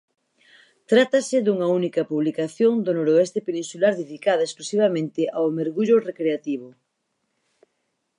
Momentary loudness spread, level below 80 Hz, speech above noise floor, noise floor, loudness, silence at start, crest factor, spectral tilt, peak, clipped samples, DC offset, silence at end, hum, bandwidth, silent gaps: 6 LU; -78 dBFS; 54 dB; -75 dBFS; -22 LUFS; 0.9 s; 18 dB; -5.5 dB/octave; -4 dBFS; under 0.1%; under 0.1%; 1.5 s; none; 11 kHz; none